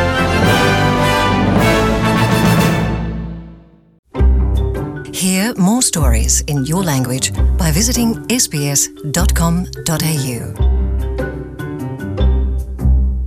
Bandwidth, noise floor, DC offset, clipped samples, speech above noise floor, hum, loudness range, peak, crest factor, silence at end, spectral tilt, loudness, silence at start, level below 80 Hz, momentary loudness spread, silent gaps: 17 kHz; -41 dBFS; under 0.1%; under 0.1%; 26 dB; none; 5 LU; -2 dBFS; 12 dB; 0 s; -4.5 dB/octave; -15 LUFS; 0 s; -20 dBFS; 11 LU; 3.99-4.03 s